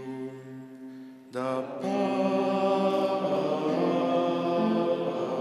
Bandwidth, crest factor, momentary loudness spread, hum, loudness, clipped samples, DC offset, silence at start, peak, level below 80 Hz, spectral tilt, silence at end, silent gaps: 12.5 kHz; 14 dB; 18 LU; none; -27 LUFS; under 0.1%; under 0.1%; 0 s; -14 dBFS; -80 dBFS; -7 dB/octave; 0 s; none